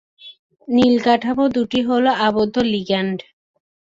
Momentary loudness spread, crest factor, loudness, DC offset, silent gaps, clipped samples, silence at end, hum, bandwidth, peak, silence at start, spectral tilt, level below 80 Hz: 6 LU; 16 dB; -18 LUFS; under 0.1%; 0.39-0.50 s; under 0.1%; 0.65 s; none; 7.6 kHz; -2 dBFS; 0.25 s; -6 dB/octave; -54 dBFS